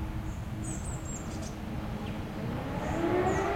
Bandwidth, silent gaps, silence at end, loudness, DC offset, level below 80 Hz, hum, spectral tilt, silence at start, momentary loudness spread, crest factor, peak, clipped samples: 16.5 kHz; none; 0 s; -34 LUFS; under 0.1%; -42 dBFS; none; -6 dB/octave; 0 s; 9 LU; 16 dB; -18 dBFS; under 0.1%